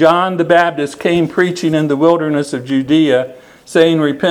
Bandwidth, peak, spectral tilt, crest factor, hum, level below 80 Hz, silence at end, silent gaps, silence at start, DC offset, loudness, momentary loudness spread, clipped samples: 12.5 kHz; 0 dBFS; -6 dB/octave; 12 dB; none; -54 dBFS; 0 s; none; 0 s; under 0.1%; -13 LUFS; 6 LU; 0.1%